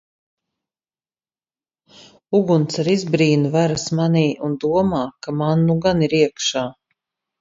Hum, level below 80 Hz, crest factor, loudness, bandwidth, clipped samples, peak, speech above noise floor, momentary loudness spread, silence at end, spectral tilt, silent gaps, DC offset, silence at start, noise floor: none; -54 dBFS; 18 dB; -19 LUFS; 7.8 kHz; under 0.1%; -2 dBFS; over 72 dB; 6 LU; 0.7 s; -6 dB/octave; none; under 0.1%; 2.3 s; under -90 dBFS